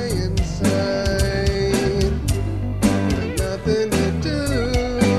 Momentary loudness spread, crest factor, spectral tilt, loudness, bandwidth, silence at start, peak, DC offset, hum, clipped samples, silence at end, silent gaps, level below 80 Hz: 4 LU; 16 dB; -5.5 dB/octave; -21 LUFS; 14 kHz; 0 s; -4 dBFS; 0.5%; none; under 0.1%; 0 s; none; -28 dBFS